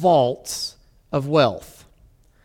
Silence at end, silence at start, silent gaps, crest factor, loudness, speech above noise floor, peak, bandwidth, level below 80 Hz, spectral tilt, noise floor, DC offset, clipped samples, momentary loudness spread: 0.8 s; 0 s; none; 18 dB; -21 LUFS; 35 dB; -6 dBFS; 17.5 kHz; -54 dBFS; -5 dB/octave; -54 dBFS; under 0.1%; under 0.1%; 12 LU